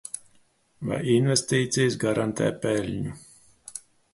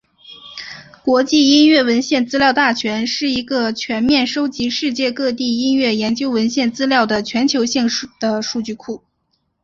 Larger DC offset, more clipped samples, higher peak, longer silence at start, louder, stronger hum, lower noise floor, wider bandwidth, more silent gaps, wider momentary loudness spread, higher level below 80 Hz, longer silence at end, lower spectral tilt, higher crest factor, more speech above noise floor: neither; neither; second, -8 dBFS vs -2 dBFS; second, 0.15 s vs 0.3 s; second, -25 LUFS vs -16 LUFS; neither; second, -62 dBFS vs -67 dBFS; first, 12 kHz vs 7.6 kHz; neither; first, 18 LU vs 13 LU; about the same, -56 dBFS vs -54 dBFS; second, 0.35 s vs 0.65 s; first, -5 dB/octave vs -3.5 dB/octave; about the same, 18 dB vs 16 dB; second, 38 dB vs 51 dB